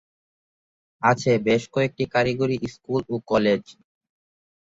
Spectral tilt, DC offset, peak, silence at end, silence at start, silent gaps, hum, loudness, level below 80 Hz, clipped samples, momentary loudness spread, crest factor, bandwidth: -6 dB/octave; under 0.1%; -4 dBFS; 0.95 s; 1 s; none; none; -23 LUFS; -56 dBFS; under 0.1%; 6 LU; 22 dB; 8 kHz